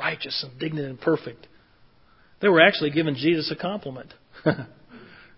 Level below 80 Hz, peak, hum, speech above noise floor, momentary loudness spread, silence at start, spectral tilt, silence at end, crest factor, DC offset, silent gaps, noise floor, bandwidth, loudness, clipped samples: -64 dBFS; 0 dBFS; none; 34 dB; 18 LU; 0 s; -9.5 dB/octave; 0.35 s; 26 dB; under 0.1%; none; -58 dBFS; 5.8 kHz; -23 LUFS; under 0.1%